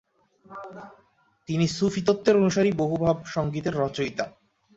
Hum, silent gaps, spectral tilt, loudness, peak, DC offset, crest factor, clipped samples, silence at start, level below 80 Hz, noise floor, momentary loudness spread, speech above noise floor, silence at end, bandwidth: none; none; -6 dB/octave; -25 LUFS; -6 dBFS; under 0.1%; 20 dB; under 0.1%; 0.5 s; -56 dBFS; -52 dBFS; 21 LU; 28 dB; 0.45 s; 8 kHz